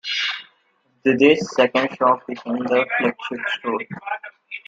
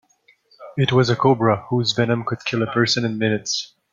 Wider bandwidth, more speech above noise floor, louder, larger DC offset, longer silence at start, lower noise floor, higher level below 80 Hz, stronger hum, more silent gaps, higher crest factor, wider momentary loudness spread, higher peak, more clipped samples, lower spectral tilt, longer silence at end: about the same, 7.8 kHz vs 7.6 kHz; first, 44 dB vs 39 dB; about the same, -20 LUFS vs -20 LUFS; neither; second, 0.05 s vs 0.6 s; first, -64 dBFS vs -58 dBFS; second, -66 dBFS vs -58 dBFS; neither; neither; about the same, 20 dB vs 18 dB; first, 14 LU vs 7 LU; about the same, -2 dBFS vs -2 dBFS; neither; about the same, -4.5 dB/octave vs -5 dB/octave; second, 0.1 s vs 0.25 s